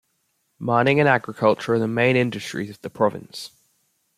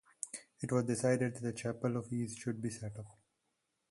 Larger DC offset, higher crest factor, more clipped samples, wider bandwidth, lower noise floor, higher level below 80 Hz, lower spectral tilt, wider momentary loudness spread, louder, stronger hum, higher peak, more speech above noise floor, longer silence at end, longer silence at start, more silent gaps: neither; about the same, 20 dB vs 20 dB; neither; first, 15 kHz vs 11.5 kHz; second, -70 dBFS vs -83 dBFS; first, -62 dBFS vs -70 dBFS; about the same, -6 dB/octave vs -6 dB/octave; first, 17 LU vs 12 LU; first, -21 LUFS vs -37 LUFS; neither; first, -2 dBFS vs -18 dBFS; about the same, 50 dB vs 47 dB; about the same, 0.7 s vs 0.8 s; first, 0.6 s vs 0.25 s; neither